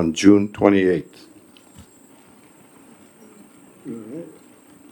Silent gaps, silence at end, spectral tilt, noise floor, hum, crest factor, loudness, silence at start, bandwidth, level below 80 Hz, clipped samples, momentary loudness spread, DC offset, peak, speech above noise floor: none; 0.65 s; -6 dB/octave; -50 dBFS; none; 22 dB; -17 LUFS; 0 s; 18.5 kHz; -60 dBFS; under 0.1%; 26 LU; under 0.1%; 0 dBFS; 33 dB